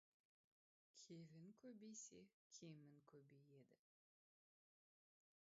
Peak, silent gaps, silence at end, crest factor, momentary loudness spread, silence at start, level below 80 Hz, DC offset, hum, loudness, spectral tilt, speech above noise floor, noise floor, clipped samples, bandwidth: -46 dBFS; 2.34-2.50 s; 1.65 s; 22 dB; 7 LU; 0.95 s; under -90 dBFS; under 0.1%; none; -63 LUFS; -6.5 dB/octave; over 26 dB; under -90 dBFS; under 0.1%; 7.6 kHz